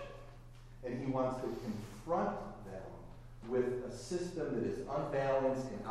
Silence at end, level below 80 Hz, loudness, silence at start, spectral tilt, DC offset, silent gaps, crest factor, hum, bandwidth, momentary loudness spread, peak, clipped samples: 0 s; -56 dBFS; -38 LUFS; 0 s; -6.5 dB/octave; under 0.1%; none; 18 dB; none; 13.5 kHz; 19 LU; -22 dBFS; under 0.1%